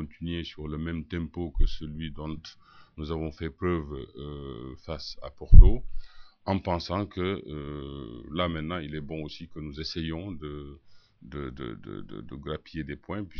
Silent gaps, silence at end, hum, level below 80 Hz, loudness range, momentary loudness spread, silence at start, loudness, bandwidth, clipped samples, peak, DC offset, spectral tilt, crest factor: none; 0 s; none; -28 dBFS; 11 LU; 12 LU; 0 s; -31 LUFS; 6 kHz; under 0.1%; 0 dBFS; under 0.1%; -6 dB/octave; 24 dB